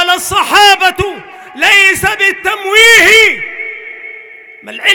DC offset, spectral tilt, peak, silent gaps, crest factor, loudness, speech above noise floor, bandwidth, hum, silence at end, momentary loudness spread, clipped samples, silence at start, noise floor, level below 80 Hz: under 0.1%; -1 dB/octave; 0 dBFS; none; 10 dB; -6 LUFS; 25 dB; over 20 kHz; none; 0 s; 23 LU; 0.6%; 0 s; -33 dBFS; -40 dBFS